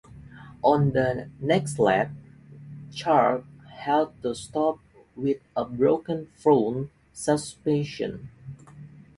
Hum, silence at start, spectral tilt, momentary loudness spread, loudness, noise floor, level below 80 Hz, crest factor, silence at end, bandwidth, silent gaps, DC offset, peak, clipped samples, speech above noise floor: none; 0.1 s; -6 dB/octave; 22 LU; -25 LUFS; -47 dBFS; -58 dBFS; 20 dB; 0.3 s; 11.5 kHz; none; under 0.1%; -6 dBFS; under 0.1%; 22 dB